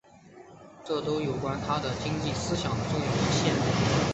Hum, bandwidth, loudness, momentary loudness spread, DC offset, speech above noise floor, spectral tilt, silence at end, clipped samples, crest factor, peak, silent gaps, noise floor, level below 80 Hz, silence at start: none; 8.4 kHz; -28 LUFS; 6 LU; under 0.1%; 24 dB; -5 dB/octave; 0 s; under 0.1%; 16 dB; -12 dBFS; none; -51 dBFS; -48 dBFS; 0.25 s